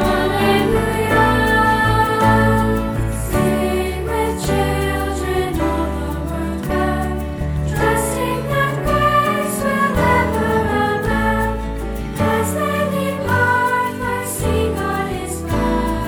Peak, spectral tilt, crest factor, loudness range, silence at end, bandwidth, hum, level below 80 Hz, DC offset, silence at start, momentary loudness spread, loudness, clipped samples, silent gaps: -4 dBFS; -5.5 dB/octave; 12 dB; 4 LU; 0 s; over 20 kHz; none; -28 dBFS; under 0.1%; 0 s; 8 LU; -18 LUFS; under 0.1%; none